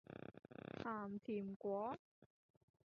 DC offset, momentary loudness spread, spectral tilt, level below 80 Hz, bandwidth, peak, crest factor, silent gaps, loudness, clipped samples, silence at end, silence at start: under 0.1%; 12 LU; -6.5 dB/octave; -80 dBFS; 6.6 kHz; -32 dBFS; 18 dB; 1.56-1.60 s, 1.99-2.22 s; -48 LUFS; under 0.1%; 0.65 s; 0.1 s